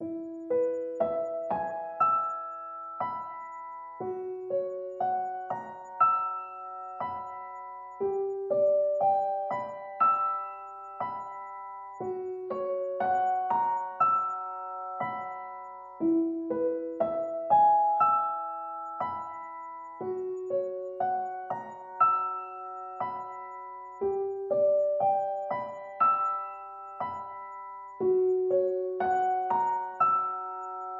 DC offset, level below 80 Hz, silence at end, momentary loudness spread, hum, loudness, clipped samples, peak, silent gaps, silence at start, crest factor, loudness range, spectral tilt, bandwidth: under 0.1%; -76 dBFS; 0 s; 16 LU; none; -30 LUFS; under 0.1%; -12 dBFS; none; 0 s; 18 dB; 5 LU; -8 dB/octave; 7.4 kHz